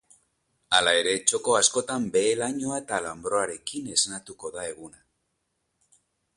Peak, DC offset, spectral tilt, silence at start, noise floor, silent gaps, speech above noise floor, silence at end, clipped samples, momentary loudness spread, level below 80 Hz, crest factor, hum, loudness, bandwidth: -4 dBFS; under 0.1%; -1.5 dB/octave; 0.7 s; -77 dBFS; none; 51 dB; 1.5 s; under 0.1%; 14 LU; -64 dBFS; 24 dB; none; -24 LUFS; 11.5 kHz